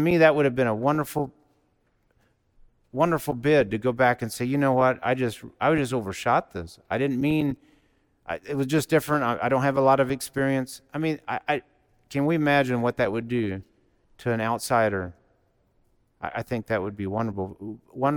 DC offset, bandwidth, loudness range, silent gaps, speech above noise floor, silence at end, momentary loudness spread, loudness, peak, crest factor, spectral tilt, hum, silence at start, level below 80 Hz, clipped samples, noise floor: under 0.1%; 19 kHz; 5 LU; none; 44 dB; 0 s; 13 LU; -25 LUFS; -6 dBFS; 20 dB; -6 dB/octave; none; 0 s; -56 dBFS; under 0.1%; -68 dBFS